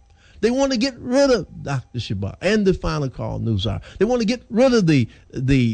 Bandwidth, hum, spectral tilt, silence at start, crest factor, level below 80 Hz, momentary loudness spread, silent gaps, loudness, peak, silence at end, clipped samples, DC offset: 9.4 kHz; none; -6 dB/octave; 0.4 s; 16 dB; -38 dBFS; 10 LU; none; -21 LUFS; -4 dBFS; 0 s; under 0.1%; under 0.1%